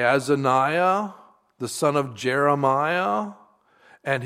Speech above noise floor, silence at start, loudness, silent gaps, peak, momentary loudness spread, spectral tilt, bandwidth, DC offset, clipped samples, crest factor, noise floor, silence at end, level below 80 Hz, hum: 35 dB; 0 s; -22 LUFS; none; -6 dBFS; 14 LU; -5 dB/octave; 15.5 kHz; under 0.1%; under 0.1%; 18 dB; -56 dBFS; 0 s; -72 dBFS; none